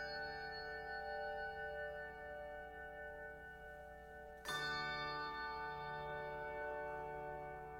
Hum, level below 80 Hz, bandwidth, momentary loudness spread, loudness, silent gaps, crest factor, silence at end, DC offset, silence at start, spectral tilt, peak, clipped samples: none; -64 dBFS; 16 kHz; 11 LU; -47 LUFS; none; 16 dB; 0 s; under 0.1%; 0 s; -3.5 dB/octave; -32 dBFS; under 0.1%